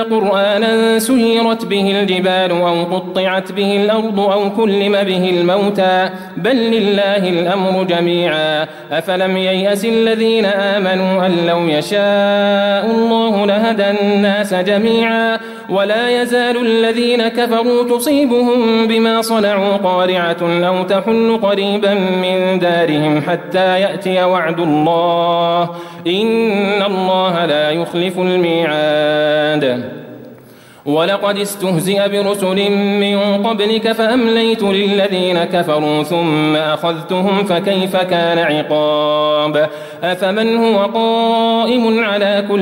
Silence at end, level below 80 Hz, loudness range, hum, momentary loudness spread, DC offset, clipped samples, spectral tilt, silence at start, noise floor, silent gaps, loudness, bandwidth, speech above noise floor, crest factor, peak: 0 s; -58 dBFS; 2 LU; none; 4 LU; under 0.1%; under 0.1%; -5.5 dB/octave; 0 s; -40 dBFS; none; -14 LUFS; 16.5 kHz; 26 dB; 12 dB; -2 dBFS